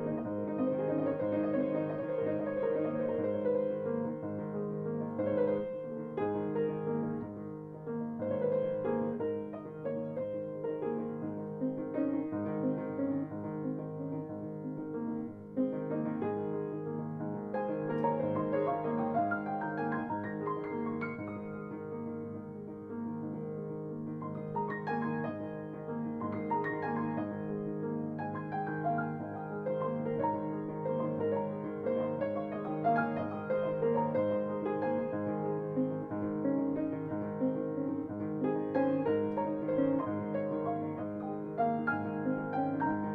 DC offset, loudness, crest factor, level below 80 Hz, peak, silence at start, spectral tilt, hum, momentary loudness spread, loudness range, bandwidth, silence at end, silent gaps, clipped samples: under 0.1%; -35 LUFS; 16 dB; -70 dBFS; -18 dBFS; 0 s; -11 dB/octave; none; 8 LU; 5 LU; 4.5 kHz; 0 s; none; under 0.1%